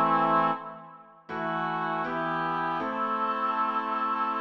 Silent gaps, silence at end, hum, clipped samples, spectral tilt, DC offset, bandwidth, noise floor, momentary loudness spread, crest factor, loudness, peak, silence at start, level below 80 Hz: none; 0 s; none; under 0.1%; -7 dB/octave; under 0.1%; 6.6 kHz; -49 dBFS; 10 LU; 16 dB; -28 LUFS; -12 dBFS; 0 s; -76 dBFS